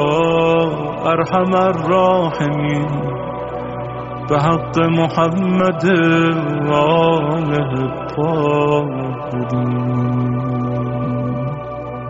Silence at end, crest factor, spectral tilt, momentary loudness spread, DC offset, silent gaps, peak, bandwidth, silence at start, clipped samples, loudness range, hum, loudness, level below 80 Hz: 0 s; 16 dB; -6 dB/octave; 10 LU; under 0.1%; none; -2 dBFS; 7.8 kHz; 0 s; under 0.1%; 3 LU; none; -17 LUFS; -44 dBFS